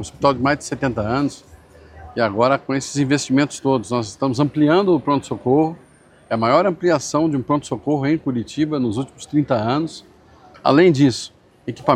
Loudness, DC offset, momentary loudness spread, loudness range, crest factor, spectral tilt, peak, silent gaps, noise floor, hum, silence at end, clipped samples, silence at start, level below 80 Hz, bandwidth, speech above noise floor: -19 LUFS; under 0.1%; 9 LU; 2 LU; 18 dB; -6 dB/octave; 0 dBFS; none; -47 dBFS; none; 0 s; under 0.1%; 0 s; -50 dBFS; 10.5 kHz; 29 dB